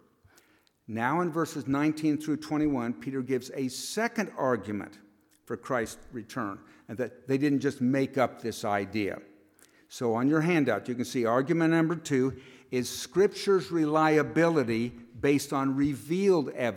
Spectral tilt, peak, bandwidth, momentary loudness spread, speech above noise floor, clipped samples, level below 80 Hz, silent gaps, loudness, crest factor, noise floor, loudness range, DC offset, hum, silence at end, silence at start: -6 dB/octave; -12 dBFS; 16.5 kHz; 12 LU; 37 dB; under 0.1%; -64 dBFS; none; -28 LUFS; 18 dB; -65 dBFS; 6 LU; under 0.1%; none; 0 s; 0.9 s